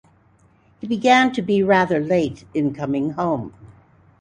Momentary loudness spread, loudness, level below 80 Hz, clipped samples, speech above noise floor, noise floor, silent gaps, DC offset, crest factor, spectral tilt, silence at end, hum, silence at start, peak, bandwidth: 12 LU; -19 LUFS; -56 dBFS; under 0.1%; 37 dB; -56 dBFS; none; under 0.1%; 18 dB; -6 dB/octave; 0.5 s; none; 0.85 s; -2 dBFS; 10 kHz